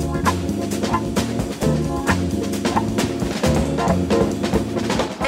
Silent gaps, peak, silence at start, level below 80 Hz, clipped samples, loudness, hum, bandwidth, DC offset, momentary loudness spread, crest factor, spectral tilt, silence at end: none; -4 dBFS; 0 s; -34 dBFS; under 0.1%; -21 LUFS; none; 16 kHz; under 0.1%; 3 LU; 16 dB; -5.5 dB/octave; 0 s